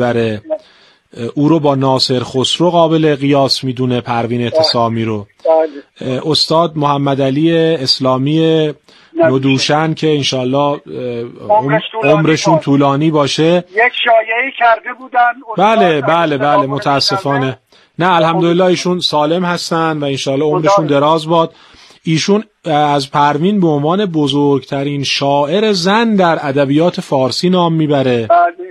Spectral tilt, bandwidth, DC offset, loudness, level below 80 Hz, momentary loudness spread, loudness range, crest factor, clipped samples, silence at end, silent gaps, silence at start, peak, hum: -5.5 dB/octave; 12.5 kHz; under 0.1%; -13 LUFS; -56 dBFS; 6 LU; 2 LU; 12 dB; under 0.1%; 0 s; none; 0 s; 0 dBFS; none